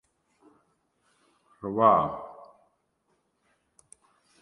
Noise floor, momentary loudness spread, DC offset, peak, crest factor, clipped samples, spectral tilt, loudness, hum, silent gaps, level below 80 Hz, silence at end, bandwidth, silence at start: -74 dBFS; 20 LU; under 0.1%; -8 dBFS; 24 dB; under 0.1%; -7.5 dB/octave; -24 LUFS; none; none; -66 dBFS; 2 s; 11 kHz; 1.65 s